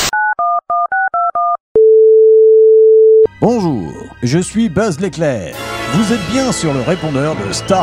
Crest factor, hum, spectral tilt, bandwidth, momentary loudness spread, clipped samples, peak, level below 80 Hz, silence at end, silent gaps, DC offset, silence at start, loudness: 12 dB; none; -5 dB/octave; 16 kHz; 11 LU; under 0.1%; 0 dBFS; -42 dBFS; 0 s; 1.60-1.75 s; under 0.1%; 0 s; -12 LUFS